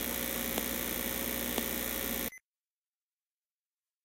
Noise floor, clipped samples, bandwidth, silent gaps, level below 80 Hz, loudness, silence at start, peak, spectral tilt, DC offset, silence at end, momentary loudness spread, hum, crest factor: under -90 dBFS; under 0.1%; 17 kHz; none; -52 dBFS; -33 LUFS; 0 s; -14 dBFS; -2.5 dB/octave; under 0.1%; 1.65 s; 2 LU; none; 24 dB